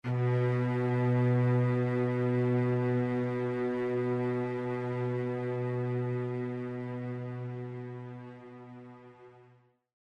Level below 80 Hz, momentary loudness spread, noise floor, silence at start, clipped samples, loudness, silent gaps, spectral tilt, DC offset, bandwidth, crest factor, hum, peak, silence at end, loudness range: -72 dBFS; 16 LU; -63 dBFS; 0.05 s; under 0.1%; -31 LUFS; none; -10 dB/octave; under 0.1%; 5.2 kHz; 14 dB; none; -18 dBFS; 0.7 s; 11 LU